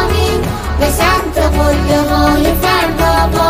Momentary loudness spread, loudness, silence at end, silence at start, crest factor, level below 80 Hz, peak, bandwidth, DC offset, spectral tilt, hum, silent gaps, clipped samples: 4 LU; -12 LUFS; 0 s; 0 s; 10 dB; -18 dBFS; 0 dBFS; 16 kHz; under 0.1%; -5 dB/octave; none; none; under 0.1%